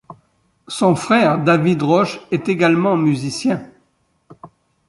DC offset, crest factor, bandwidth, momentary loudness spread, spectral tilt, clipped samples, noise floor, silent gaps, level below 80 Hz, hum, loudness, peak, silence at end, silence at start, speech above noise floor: under 0.1%; 16 dB; 11.5 kHz; 7 LU; -6 dB/octave; under 0.1%; -63 dBFS; none; -58 dBFS; none; -16 LUFS; -2 dBFS; 0.4 s; 0.1 s; 47 dB